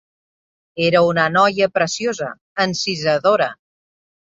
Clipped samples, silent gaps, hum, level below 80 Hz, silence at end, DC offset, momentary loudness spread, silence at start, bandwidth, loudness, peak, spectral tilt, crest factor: under 0.1%; 2.41-2.56 s; none; -60 dBFS; 0.7 s; under 0.1%; 9 LU; 0.75 s; 7.8 kHz; -18 LUFS; -2 dBFS; -4 dB/octave; 16 dB